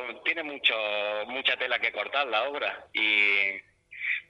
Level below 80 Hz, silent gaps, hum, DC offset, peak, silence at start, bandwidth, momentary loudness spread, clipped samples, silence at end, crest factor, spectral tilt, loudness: -74 dBFS; none; none; under 0.1%; -10 dBFS; 0 s; 8.8 kHz; 9 LU; under 0.1%; 0.05 s; 20 dB; -2.5 dB/octave; -26 LUFS